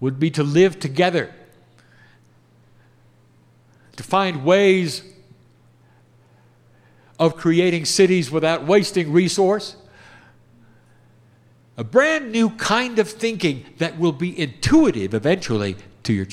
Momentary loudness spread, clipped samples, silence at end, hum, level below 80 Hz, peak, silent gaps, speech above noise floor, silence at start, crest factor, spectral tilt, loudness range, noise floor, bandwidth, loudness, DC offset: 9 LU; under 0.1%; 0 s; none; -52 dBFS; -2 dBFS; none; 36 dB; 0 s; 18 dB; -5 dB/octave; 6 LU; -54 dBFS; 14.5 kHz; -19 LUFS; under 0.1%